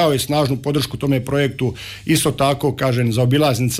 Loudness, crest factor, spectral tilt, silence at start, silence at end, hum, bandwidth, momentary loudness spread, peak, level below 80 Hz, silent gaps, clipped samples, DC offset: -18 LUFS; 12 dB; -5.5 dB/octave; 0 s; 0 s; none; 16 kHz; 5 LU; -6 dBFS; -44 dBFS; none; under 0.1%; under 0.1%